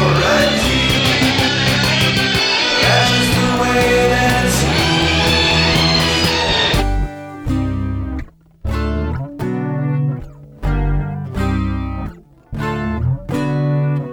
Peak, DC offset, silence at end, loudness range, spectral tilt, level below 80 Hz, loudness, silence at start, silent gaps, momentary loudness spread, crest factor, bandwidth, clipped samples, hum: 0 dBFS; under 0.1%; 0 s; 9 LU; -4.5 dB/octave; -26 dBFS; -15 LUFS; 0 s; none; 12 LU; 16 dB; over 20 kHz; under 0.1%; none